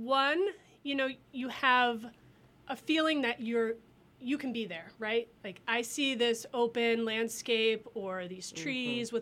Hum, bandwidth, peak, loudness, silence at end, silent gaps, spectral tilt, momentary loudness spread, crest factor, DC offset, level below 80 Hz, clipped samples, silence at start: none; 15.5 kHz; -12 dBFS; -32 LUFS; 0 s; none; -3 dB/octave; 13 LU; 20 dB; under 0.1%; -74 dBFS; under 0.1%; 0 s